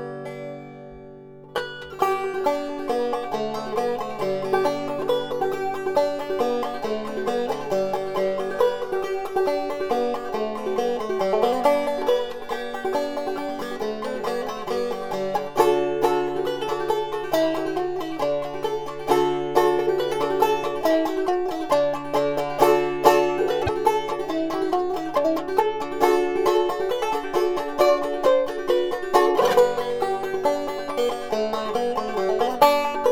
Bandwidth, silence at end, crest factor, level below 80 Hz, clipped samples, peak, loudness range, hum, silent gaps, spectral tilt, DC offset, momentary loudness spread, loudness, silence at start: 17.5 kHz; 0 s; 22 dB; -54 dBFS; under 0.1%; -2 dBFS; 4 LU; none; none; -4.5 dB/octave; under 0.1%; 8 LU; -23 LUFS; 0 s